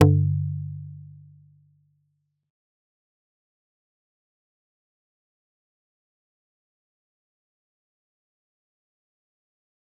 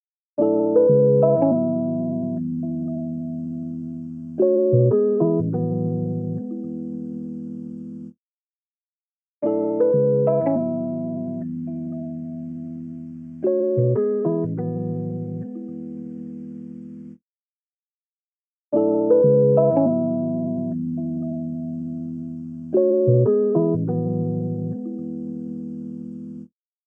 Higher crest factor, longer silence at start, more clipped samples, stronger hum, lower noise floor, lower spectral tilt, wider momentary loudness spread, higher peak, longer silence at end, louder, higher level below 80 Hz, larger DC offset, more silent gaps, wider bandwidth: first, 28 dB vs 18 dB; second, 0 s vs 0.4 s; neither; neither; second, -74 dBFS vs under -90 dBFS; second, -9 dB/octave vs -14 dB/octave; first, 24 LU vs 17 LU; about the same, -2 dBFS vs -4 dBFS; first, 8.95 s vs 0.4 s; second, -25 LUFS vs -22 LUFS; first, -64 dBFS vs -70 dBFS; neither; second, none vs 8.18-9.41 s, 17.22-18.72 s; first, 3.8 kHz vs 2.4 kHz